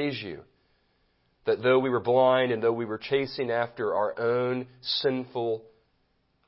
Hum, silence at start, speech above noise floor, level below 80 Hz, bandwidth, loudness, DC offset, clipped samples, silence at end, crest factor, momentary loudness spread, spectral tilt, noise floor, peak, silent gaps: none; 0 s; 44 dB; -68 dBFS; 5.8 kHz; -27 LUFS; under 0.1%; under 0.1%; 0.85 s; 18 dB; 11 LU; -9.5 dB/octave; -71 dBFS; -10 dBFS; none